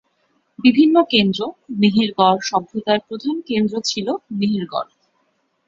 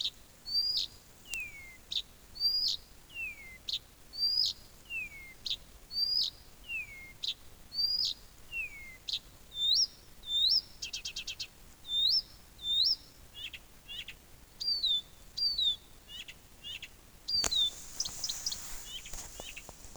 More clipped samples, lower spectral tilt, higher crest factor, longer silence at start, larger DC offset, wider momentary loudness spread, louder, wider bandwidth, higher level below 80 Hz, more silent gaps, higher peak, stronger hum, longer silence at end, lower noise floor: neither; first, -5 dB/octave vs 1 dB/octave; second, 18 dB vs 28 dB; first, 0.6 s vs 0 s; neither; second, 11 LU vs 18 LU; first, -18 LUFS vs -32 LUFS; second, 7.6 kHz vs over 20 kHz; about the same, -60 dBFS vs -58 dBFS; neither; first, -2 dBFS vs -8 dBFS; neither; first, 0.85 s vs 0 s; first, -66 dBFS vs -54 dBFS